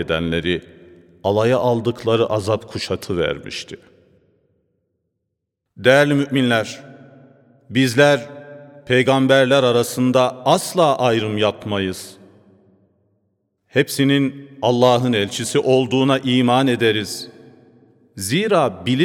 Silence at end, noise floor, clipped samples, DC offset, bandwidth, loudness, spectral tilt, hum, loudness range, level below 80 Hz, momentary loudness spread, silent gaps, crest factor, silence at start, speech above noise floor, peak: 0 s; -77 dBFS; under 0.1%; under 0.1%; 17 kHz; -18 LUFS; -5 dB/octave; none; 6 LU; -54 dBFS; 12 LU; none; 18 dB; 0 s; 60 dB; 0 dBFS